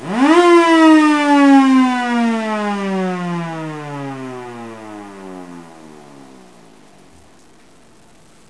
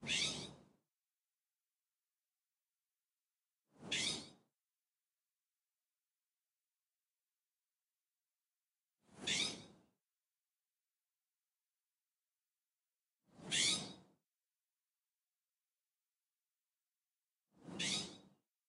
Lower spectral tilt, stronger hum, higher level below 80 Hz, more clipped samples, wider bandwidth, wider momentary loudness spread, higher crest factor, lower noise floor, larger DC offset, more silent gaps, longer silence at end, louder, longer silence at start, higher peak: first, -5.5 dB/octave vs -1 dB/octave; neither; first, -64 dBFS vs -82 dBFS; neither; second, 11 kHz vs 15.5 kHz; first, 24 LU vs 19 LU; second, 16 dB vs 26 dB; second, -48 dBFS vs under -90 dBFS; first, 0.4% vs under 0.1%; second, none vs 3.20-3.24 s; first, 2.55 s vs 0.45 s; first, -13 LUFS vs -39 LUFS; about the same, 0 s vs 0 s; first, 0 dBFS vs -22 dBFS